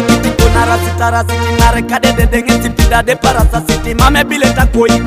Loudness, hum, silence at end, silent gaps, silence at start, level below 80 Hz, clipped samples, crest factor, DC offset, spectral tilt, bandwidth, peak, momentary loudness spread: -11 LUFS; none; 0 s; none; 0 s; -16 dBFS; 0.5%; 10 dB; 0.6%; -5 dB/octave; 16 kHz; 0 dBFS; 3 LU